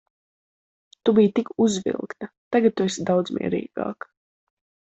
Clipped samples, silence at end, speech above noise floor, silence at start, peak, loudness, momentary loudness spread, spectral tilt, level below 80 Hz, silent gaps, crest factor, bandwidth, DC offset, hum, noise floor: under 0.1%; 1 s; over 68 dB; 1.05 s; -6 dBFS; -23 LUFS; 16 LU; -5.5 dB/octave; -64 dBFS; 2.37-2.51 s; 18 dB; 8.2 kHz; under 0.1%; none; under -90 dBFS